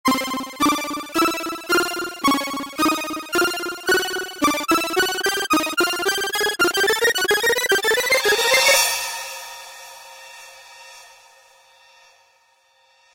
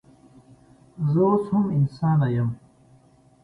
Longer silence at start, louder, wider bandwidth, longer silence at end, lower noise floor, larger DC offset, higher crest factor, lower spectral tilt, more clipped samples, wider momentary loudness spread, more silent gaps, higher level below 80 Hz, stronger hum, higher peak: second, 0.05 s vs 1 s; first, -19 LUFS vs -23 LUFS; first, 16 kHz vs 5 kHz; first, 2.1 s vs 0.9 s; about the same, -59 dBFS vs -56 dBFS; neither; first, 20 dB vs 14 dB; second, -1 dB/octave vs -11 dB/octave; neither; first, 19 LU vs 9 LU; neither; about the same, -56 dBFS vs -56 dBFS; neither; first, -2 dBFS vs -10 dBFS